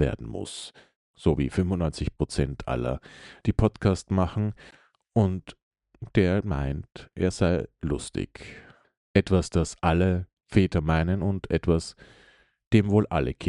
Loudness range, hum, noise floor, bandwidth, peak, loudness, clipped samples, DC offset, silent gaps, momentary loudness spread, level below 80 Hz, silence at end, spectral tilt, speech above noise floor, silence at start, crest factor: 3 LU; none; -59 dBFS; 11.5 kHz; -6 dBFS; -26 LUFS; under 0.1%; under 0.1%; 0.96-1.14 s, 5.62-5.71 s, 8.97-9.14 s, 10.33-10.37 s, 12.67-12.71 s; 13 LU; -42 dBFS; 0 s; -7 dB/octave; 33 dB; 0 s; 20 dB